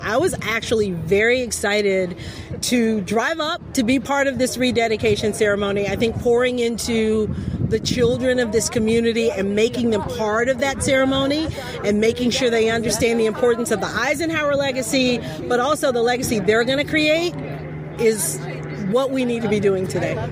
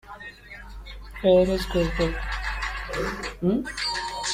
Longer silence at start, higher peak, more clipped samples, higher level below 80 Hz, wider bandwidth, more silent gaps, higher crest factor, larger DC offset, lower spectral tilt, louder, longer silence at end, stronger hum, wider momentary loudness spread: about the same, 0 s vs 0.05 s; first, -4 dBFS vs -8 dBFS; neither; second, -42 dBFS vs -36 dBFS; about the same, 16 kHz vs 15.5 kHz; neither; about the same, 14 dB vs 18 dB; neither; about the same, -4.5 dB/octave vs -5 dB/octave; first, -20 LUFS vs -25 LUFS; about the same, 0 s vs 0 s; neither; second, 5 LU vs 21 LU